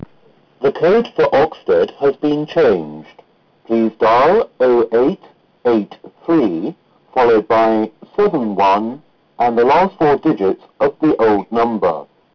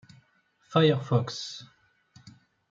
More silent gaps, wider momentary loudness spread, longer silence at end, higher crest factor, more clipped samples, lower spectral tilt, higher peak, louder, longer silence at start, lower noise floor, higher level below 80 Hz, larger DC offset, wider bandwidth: neither; second, 9 LU vs 15 LU; about the same, 0.3 s vs 0.4 s; second, 8 dB vs 22 dB; neither; about the same, -7.5 dB/octave vs -6.5 dB/octave; about the same, -8 dBFS vs -8 dBFS; first, -15 LUFS vs -27 LUFS; about the same, 0.6 s vs 0.7 s; second, -51 dBFS vs -67 dBFS; first, -50 dBFS vs -70 dBFS; neither; second, 5.4 kHz vs 7.6 kHz